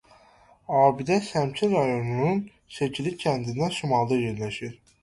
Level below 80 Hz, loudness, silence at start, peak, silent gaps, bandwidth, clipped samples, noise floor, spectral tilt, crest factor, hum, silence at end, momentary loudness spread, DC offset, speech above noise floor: -58 dBFS; -25 LUFS; 0.7 s; -6 dBFS; none; 11.5 kHz; under 0.1%; -57 dBFS; -6 dB/octave; 20 dB; none; 0.3 s; 10 LU; under 0.1%; 32 dB